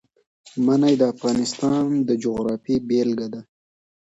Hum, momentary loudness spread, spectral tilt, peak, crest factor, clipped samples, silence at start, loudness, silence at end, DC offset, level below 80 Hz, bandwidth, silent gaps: none; 10 LU; -6 dB/octave; -6 dBFS; 16 dB; under 0.1%; 0.45 s; -21 LUFS; 0.75 s; under 0.1%; -58 dBFS; 8.2 kHz; none